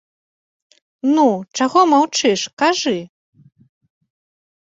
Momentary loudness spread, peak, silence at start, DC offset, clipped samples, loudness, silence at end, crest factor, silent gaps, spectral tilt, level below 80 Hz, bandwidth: 8 LU; -2 dBFS; 1.05 s; under 0.1%; under 0.1%; -16 LUFS; 1.6 s; 18 dB; 2.53-2.57 s; -3.5 dB/octave; -66 dBFS; 8 kHz